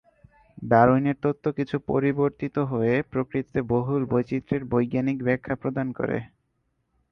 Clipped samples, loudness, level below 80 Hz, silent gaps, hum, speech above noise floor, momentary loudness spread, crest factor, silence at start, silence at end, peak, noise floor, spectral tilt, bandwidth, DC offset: under 0.1%; -25 LUFS; -54 dBFS; none; none; 49 dB; 9 LU; 20 dB; 0.6 s; 0.85 s; -4 dBFS; -73 dBFS; -10 dB/octave; 6.2 kHz; under 0.1%